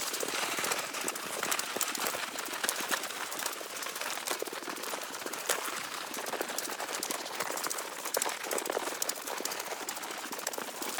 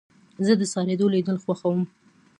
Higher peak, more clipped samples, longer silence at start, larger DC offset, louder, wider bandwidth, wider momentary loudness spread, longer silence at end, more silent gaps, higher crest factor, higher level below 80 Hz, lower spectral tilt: about the same, -4 dBFS vs -6 dBFS; neither; second, 0 s vs 0.4 s; neither; second, -34 LUFS vs -24 LUFS; first, over 20 kHz vs 11 kHz; about the same, 5 LU vs 6 LU; second, 0 s vs 0.55 s; neither; first, 32 dB vs 18 dB; second, -82 dBFS vs -70 dBFS; second, 0 dB/octave vs -6.5 dB/octave